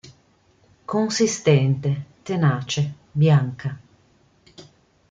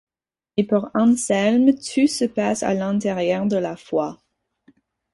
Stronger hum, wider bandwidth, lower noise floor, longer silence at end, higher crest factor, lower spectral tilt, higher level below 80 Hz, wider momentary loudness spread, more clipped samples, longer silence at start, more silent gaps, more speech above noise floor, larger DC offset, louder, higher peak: neither; second, 8.8 kHz vs 11.5 kHz; second, -59 dBFS vs under -90 dBFS; second, 0.5 s vs 1 s; about the same, 18 dB vs 16 dB; about the same, -6 dB/octave vs -5 dB/octave; about the same, -60 dBFS vs -60 dBFS; first, 14 LU vs 7 LU; neither; second, 0.05 s vs 0.55 s; neither; second, 39 dB vs over 70 dB; neither; about the same, -21 LUFS vs -20 LUFS; about the same, -4 dBFS vs -4 dBFS